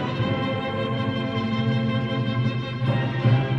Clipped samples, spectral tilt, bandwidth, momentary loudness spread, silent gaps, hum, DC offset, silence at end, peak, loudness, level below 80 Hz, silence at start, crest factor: under 0.1%; -8 dB/octave; 6.2 kHz; 4 LU; none; none; under 0.1%; 0 s; -8 dBFS; -24 LUFS; -50 dBFS; 0 s; 16 dB